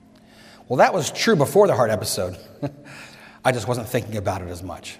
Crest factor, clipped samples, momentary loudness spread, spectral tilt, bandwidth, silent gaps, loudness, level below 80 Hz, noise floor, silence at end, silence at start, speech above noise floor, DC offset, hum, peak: 20 dB; under 0.1%; 17 LU; -4.5 dB/octave; 16 kHz; none; -21 LUFS; -58 dBFS; -49 dBFS; 0.05 s; 0.7 s; 27 dB; under 0.1%; none; -2 dBFS